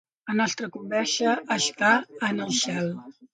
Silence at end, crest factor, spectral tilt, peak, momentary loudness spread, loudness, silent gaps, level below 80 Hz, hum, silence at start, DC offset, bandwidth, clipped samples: 0.1 s; 18 dB; -3 dB/octave; -8 dBFS; 9 LU; -25 LUFS; none; -74 dBFS; none; 0.25 s; under 0.1%; 9.6 kHz; under 0.1%